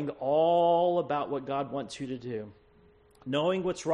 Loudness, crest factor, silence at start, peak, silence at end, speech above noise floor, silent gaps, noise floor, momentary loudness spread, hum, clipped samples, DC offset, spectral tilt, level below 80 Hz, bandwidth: -29 LUFS; 14 dB; 0 s; -14 dBFS; 0 s; 31 dB; none; -60 dBFS; 15 LU; none; under 0.1%; under 0.1%; -6 dB/octave; -66 dBFS; 11 kHz